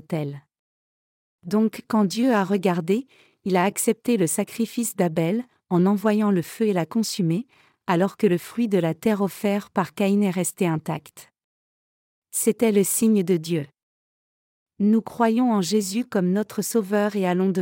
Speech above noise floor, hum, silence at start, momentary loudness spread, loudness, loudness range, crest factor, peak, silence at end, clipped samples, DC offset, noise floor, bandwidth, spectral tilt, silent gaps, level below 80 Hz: over 68 dB; none; 0.1 s; 8 LU; -23 LUFS; 2 LU; 16 dB; -8 dBFS; 0 s; under 0.1%; under 0.1%; under -90 dBFS; 17 kHz; -5.5 dB/octave; 0.59-1.39 s, 11.44-12.22 s, 13.83-14.66 s; -70 dBFS